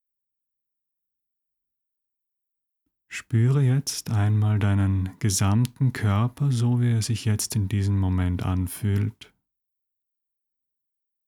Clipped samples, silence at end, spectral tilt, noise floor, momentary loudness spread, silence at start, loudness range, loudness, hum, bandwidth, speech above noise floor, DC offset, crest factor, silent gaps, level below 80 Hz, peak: under 0.1%; 2.15 s; -6 dB/octave; -83 dBFS; 5 LU; 3.1 s; 6 LU; -24 LUFS; none; 16 kHz; 61 dB; under 0.1%; 16 dB; none; -52 dBFS; -10 dBFS